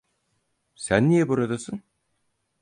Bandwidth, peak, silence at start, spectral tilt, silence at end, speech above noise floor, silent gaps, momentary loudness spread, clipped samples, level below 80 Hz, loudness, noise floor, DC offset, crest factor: 11 kHz; -6 dBFS; 0.8 s; -6.5 dB/octave; 0.8 s; 51 dB; none; 17 LU; under 0.1%; -56 dBFS; -23 LUFS; -73 dBFS; under 0.1%; 20 dB